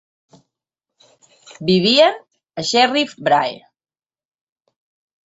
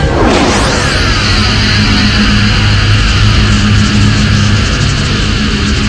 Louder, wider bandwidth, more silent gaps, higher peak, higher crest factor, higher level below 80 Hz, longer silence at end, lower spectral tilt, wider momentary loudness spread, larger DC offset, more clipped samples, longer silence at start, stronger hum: second, -16 LUFS vs -9 LUFS; second, 8 kHz vs 11 kHz; neither; about the same, -2 dBFS vs 0 dBFS; first, 18 dB vs 8 dB; second, -62 dBFS vs -14 dBFS; first, 1.7 s vs 0 s; about the same, -4 dB/octave vs -4.5 dB/octave; first, 19 LU vs 3 LU; second, under 0.1% vs 0.6%; second, under 0.1% vs 0.6%; first, 1.6 s vs 0 s; neither